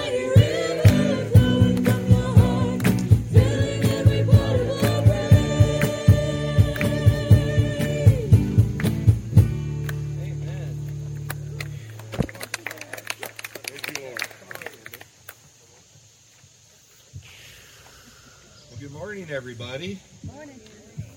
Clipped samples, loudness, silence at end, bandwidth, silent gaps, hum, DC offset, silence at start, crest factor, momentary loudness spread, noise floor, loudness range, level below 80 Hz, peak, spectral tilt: under 0.1%; -21 LUFS; 0.1 s; 17 kHz; none; none; under 0.1%; 0 s; 20 dB; 19 LU; -53 dBFS; 18 LU; -36 dBFS; -2 dBFS; -7 dB/octave